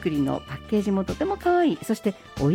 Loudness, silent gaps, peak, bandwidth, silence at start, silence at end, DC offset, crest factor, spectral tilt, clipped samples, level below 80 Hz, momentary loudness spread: -25 LUFS; none; -12 dBFS; 16.5 kHz; 0 s; 0 s; under 0.1%; 12 dB; -7 dB/octave; under 0.1%; -46 dBFS; 6 LU